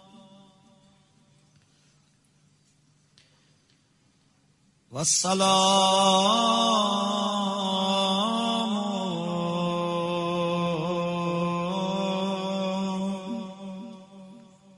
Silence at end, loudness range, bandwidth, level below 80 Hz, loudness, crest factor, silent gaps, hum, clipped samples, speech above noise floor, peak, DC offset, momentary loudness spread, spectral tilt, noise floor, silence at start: 0.35 s; 8 LU; 11.5 kHz; -68 dBFS; -25 LUFS; 20 dB; none; none; under 0.1%; 43 dB; -8 dBFS; under 0.1%; 13 LU; -3.5 dB/octave; -65 dBFS; 0.15 s